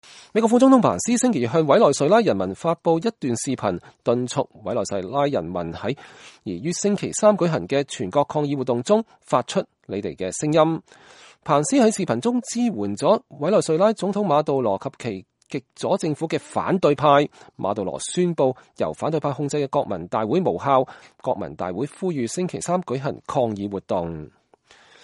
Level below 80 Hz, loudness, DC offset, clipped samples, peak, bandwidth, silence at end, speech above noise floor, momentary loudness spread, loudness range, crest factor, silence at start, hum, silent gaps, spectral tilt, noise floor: -60 dBFS; -22 LUFS; under 0.1%; under 0.1%; -2 dBFS; 11.5 kHz; 0.75 s; 33 dB; 12 LU; 5 LU; 20 dB; 0.1 s; none; none; -5.5 dB/octave; -54 dBFS